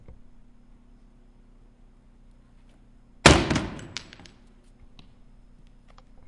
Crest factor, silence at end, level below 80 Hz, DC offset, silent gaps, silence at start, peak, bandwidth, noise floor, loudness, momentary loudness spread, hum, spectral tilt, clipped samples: 30 dB; 2.4 s; -42 dBFS; under 0.1%; none; 0.1 s; 0 dBFS; 11.5 kHz; -53 dBFS; -21 LUFS; 22 LU; 60 Hz at -55 dBFS; -4 dB/octave; under 0.1%